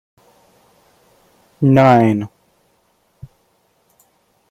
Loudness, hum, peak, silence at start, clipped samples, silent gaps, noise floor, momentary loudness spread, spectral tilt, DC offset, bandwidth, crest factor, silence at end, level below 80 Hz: -13 LUFS; none; 0 dBFS; 1.6 s; under 0.1%; none; -61 dBFS; 14 LU; -8.5 dB/octave; under 0.1%; 12.5 kHz; 18 dB; 2.25 s; -56 dBFS